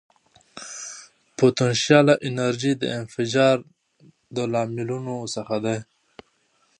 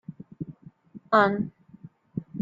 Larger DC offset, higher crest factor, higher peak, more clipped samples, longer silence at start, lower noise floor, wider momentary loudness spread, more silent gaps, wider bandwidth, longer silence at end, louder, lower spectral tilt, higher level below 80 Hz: neither; about the same, 22 dB vs 24 dB; about the same, -2 dBFS vs -4 dBFS; neither; first, 0.55 s vs 0.1 s; first, -65 dBFS vs -50 dBFS; about the same, 18 LU vs 19 LU; neither; first, 10.5 kHz vs 7.6 kHz; first, 0.95 s vs 0 s; about the same, -22 LUFS vs -24 LUFS; second, -5 dB/octave vs -8 dB/octave; about the same, -66 dBFS vs -66 dBFS